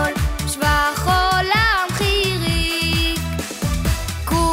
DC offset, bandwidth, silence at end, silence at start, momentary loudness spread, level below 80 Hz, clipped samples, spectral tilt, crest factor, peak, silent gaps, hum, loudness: under 0.1%; 16.5 kHz; 0 s; 0 s; 7 LU; -26 dBFS; under 0.1%; -4 dB/octave; 16 dB; -4 dBFS; none; none; -19 LUFS